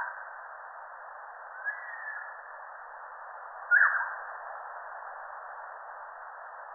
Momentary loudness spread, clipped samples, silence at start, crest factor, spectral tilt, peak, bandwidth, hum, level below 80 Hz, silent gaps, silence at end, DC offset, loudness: 19 LU; under 0.1%; 0 s; 24 dB; 14.5 dB/octave; -12 dBFS; 2.1 kHz; none; -82 dBFS; none; 0 s; under 0.1%; -32 LUFS